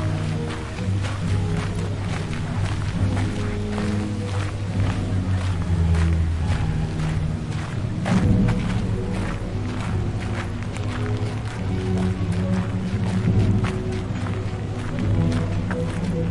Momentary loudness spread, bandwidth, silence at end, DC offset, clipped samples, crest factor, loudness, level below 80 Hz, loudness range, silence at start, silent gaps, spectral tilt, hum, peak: 7 LU; 11 kHz; 0 s; under 0.1%; under 0.1%; 16 dB; -24 LUFS; -34 dBFS; 2 LU; 0 s; none; -7 dB/octave; none; -6 dBFS